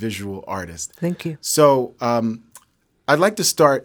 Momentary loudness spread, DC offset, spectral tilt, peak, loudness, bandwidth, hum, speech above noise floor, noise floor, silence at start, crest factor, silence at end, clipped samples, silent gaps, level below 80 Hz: 14 LU; under 0.1%; -4 dB/octave; 0 dBFS; -19 LUFS; over 20 kHz; none; 38 dB; -57 dBFS; 0 s; 20 dB; 0 s; under 0.1%; none; -58 dBFS